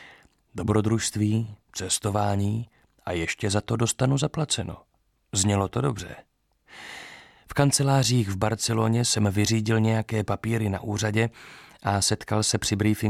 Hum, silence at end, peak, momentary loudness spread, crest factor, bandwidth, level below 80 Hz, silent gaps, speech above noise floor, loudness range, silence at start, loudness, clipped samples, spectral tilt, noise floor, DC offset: none; 0 s; -6 dBFS; 17 LU; 20 dB; 15 kHz; -52 dBFS; none; 29 dB; 4 LU; 0 s; -25 LUFS; under 0.1%; -4.5 dB/octave; -54 dBFS; under 0.1%